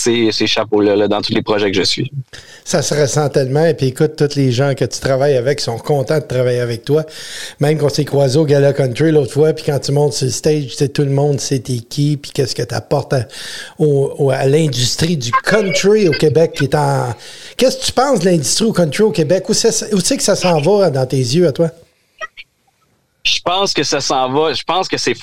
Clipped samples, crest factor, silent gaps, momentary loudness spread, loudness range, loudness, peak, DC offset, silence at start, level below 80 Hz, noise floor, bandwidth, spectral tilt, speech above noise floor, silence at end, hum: under 0.1%; 14 dB; none; 7 LU; 3 LU; -14 LUFS; 0 dBFS; 1%; 0 s; -48 dBFS; -60 dBFS; 15.5 kHz; -5 dB/octave; 45 dB; 0 s; none